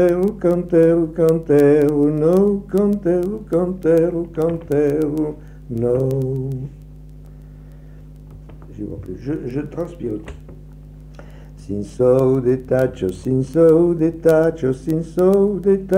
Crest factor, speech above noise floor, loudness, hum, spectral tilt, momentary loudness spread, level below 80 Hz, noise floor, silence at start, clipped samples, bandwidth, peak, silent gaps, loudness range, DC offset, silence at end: 14 dB; 22 dB; -18 LUFS; none; -9 dB/octave; 15 LU; -40 dBFS; -38 dBFS; 0 s; under 0.1%; 16 kHz; -4 dBFS; none; 14 LU; under 0.1%; 0 s